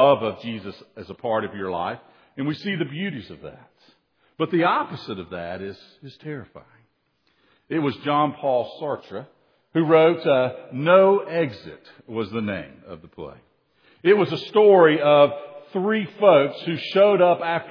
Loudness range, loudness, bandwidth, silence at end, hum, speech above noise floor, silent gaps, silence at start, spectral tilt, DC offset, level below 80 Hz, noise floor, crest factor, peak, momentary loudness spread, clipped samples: 11 LU; -21 LUFS; 5.4 kHz; 0 s; none; 47 dB; none; 0 s; -8 dB/octave; under 0.1%; -66 dBFS; -68 dBFS; 20 dB; -2 dBFS; 23 LU; under 0.1%